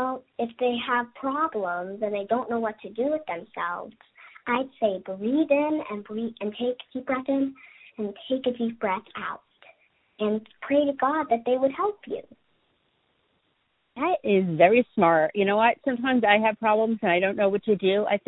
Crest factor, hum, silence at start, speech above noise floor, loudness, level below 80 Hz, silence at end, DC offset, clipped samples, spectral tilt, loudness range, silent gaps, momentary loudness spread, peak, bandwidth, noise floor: 22 dB; none; 0 s; 47 dB; -25 LUFS; -68 dBFS; 0.1 s; under 0.1%; under 0.1%; -10 dB/octave; 8 LU; none; 14 LU; -4 dBFS; 4.1 kHz; -72 dBFS